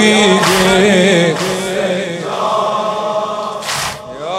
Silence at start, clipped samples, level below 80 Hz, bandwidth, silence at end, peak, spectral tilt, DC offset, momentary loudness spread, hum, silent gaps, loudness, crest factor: 0 s; under 0.1%; -46 dBFS; 16.5 kHz; 0 s; 0 dBFS; -4 dB/octave; under 0.1%; 11 LU; none; none; -13 LUFS; 14 dB